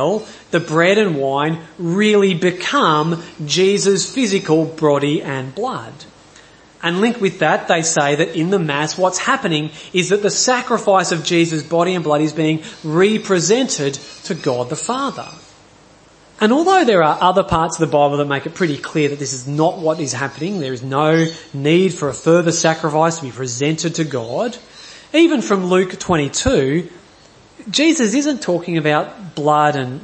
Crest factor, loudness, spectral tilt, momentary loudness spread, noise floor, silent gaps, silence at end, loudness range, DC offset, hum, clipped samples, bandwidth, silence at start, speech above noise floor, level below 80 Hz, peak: 16 dB; -17 LUFS; -4.5 dB/octave; 9 LU; -47 dBFS; none; 0 s; 3 LU; under 0.1%; none; under 0.1%; 8.8 kHz; 0 s; 30 dB; -48 dBFS; 0 dBFS